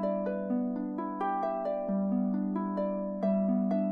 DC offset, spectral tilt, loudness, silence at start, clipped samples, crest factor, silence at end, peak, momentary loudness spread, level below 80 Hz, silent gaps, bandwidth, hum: under 0.1%; -11 dB/octave; -31 LUFS; 0 s; under 0.1%; 12 dB; 0 s; -20 dBFS; 5 LU; -72 dBFS; none; 4.9 kHz; none